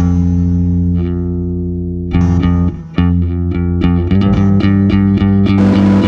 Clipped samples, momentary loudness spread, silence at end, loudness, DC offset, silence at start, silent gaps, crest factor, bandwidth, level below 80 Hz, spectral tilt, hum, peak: under 0.1%; 8 LU; 0 s; -13 LUFS; under 0.1%; 0 s; none; 12 dB; 6.6 kHz; -20 dBFS; -9.5 dB/octave; none; 0 dBFS